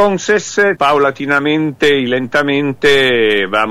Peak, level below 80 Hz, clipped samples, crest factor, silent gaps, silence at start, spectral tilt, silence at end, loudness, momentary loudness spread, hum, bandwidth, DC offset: -2 dBFS; -50 dBFS; under 0.1%; 12 dB; none; 0 s; -4 dB/octave; 0 s; -13 LUFS; 4 LU; none; 15 kHz; under 0.1%